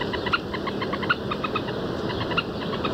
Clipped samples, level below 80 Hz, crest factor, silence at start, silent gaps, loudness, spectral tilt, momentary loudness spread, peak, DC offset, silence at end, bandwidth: under 0.1%; -46 dBFS; 18 dB; 0 s; none; -27 LUFS; -6 dB/octave; 4 LU; -8 dBFS; under 0.1%; 0 s; 16 kHz